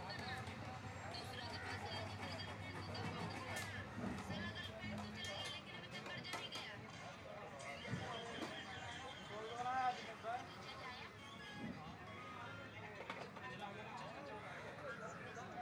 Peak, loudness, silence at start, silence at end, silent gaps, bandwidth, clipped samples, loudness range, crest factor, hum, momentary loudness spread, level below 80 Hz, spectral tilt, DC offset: -28 dBFS; -48 LUFS; 0 s; 0 s; none; over 20 kHz; under 0.1%; 5 LU; 20 dB; none; 6 LU; -70 dBFS; -4.5 dB/octave; under 0.1%